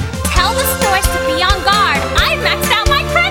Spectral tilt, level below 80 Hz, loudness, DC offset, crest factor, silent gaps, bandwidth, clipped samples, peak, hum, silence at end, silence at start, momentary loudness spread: -3 dB/octave; -22 dBFS; -13 LUFS; under 0.1%; 14 dB; none; 18 kHz; under 0.1%; 0 dBFS; none; 0 s; 0 s; 2 LU